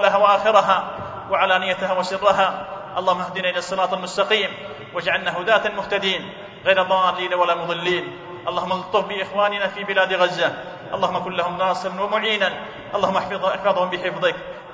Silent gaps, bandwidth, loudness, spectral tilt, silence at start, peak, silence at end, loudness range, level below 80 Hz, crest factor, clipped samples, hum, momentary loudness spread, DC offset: none; 7.8 kHz; -21 LUFS; -4 dB/octave; 0 s; -2 dBFS; 0 s; 2 LU; -58 dBFS; 20 dB; under 0.1%; none; 9 LU; under 0.1%